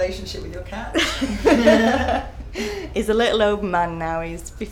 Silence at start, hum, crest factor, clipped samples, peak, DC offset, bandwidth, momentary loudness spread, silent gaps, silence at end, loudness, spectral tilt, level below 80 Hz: 0 s; none; 18 dB; under 0.1%; -4 dBFS; under 0.1%; 17 kHz; 16 LU; none; 0 s; -20 LUFS; -4.5 dB/octave; -36 dBFS